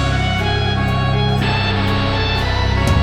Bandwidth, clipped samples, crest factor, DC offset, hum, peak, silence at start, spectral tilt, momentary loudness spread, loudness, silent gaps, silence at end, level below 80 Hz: 12.5 kHz; under 0.1%; 12 dB; under 0.1%; none; -4 dBFS; 0 s; -6 dB/octave; 1 LU; -17 LUFS; none; 0 s; -24 dBFS